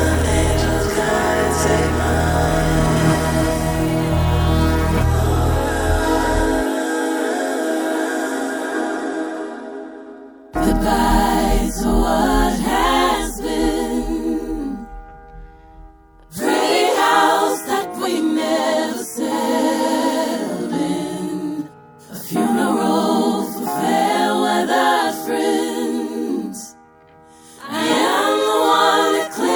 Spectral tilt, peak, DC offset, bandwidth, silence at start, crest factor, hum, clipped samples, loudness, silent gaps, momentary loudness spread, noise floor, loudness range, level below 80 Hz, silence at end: -5 dB/octave; -2 dBFS; under 0.1%; over 20 kHz; 0 s; 16 dB; none; under 0.1%; -18 LUFS; none; 10 LU; -47 dBFS; 5 LU; -30 dBFS; 0 s